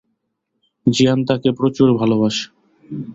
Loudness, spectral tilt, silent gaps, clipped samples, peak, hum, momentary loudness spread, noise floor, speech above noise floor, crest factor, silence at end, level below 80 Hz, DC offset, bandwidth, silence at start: -17 LUFS; -6 dB/octave; none; under 0.1%; -2 dBFS; none; 15 LU; -73 dBFS; 58 dB; 16 dB; 0 s; -54 dBFS; under 0.1%; 7.8 kHz; 0.85 s